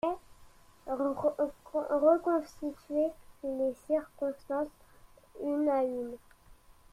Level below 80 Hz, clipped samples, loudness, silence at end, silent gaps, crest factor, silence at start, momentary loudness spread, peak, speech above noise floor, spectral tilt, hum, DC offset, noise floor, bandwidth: -64 dBFS; under 0.1%; -33 LUFS; 0.4 s; none; 20 dB; 0.05 s; 14 LU; -14 dBFS; 27 dB; -6.5 dB/octave; none; under 0.1%; -58 dBFS; 15 kHz